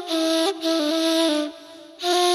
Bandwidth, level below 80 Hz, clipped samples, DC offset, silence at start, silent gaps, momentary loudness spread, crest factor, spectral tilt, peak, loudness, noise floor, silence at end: 14.5 kHz; -78 dBFS; under 0.1%; under 0.1%; 0 s; none; 9 LU; 16 dB; -0.5 dB/octave; -8 dBFS; -22 LUFS; -43 dBFS; 0 s